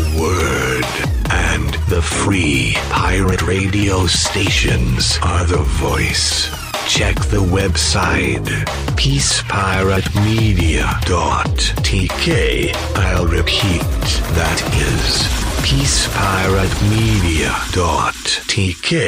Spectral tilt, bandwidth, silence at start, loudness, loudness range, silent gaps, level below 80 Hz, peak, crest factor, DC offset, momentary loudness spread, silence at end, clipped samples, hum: -4 dB/octave; 16 kHz; 0 s; -15 LUFS; 1 LU; none; -22 dBFS; -4 dBFS; 12 dB; under 0.1%; 3 LU; 0 s; under 0.1%; none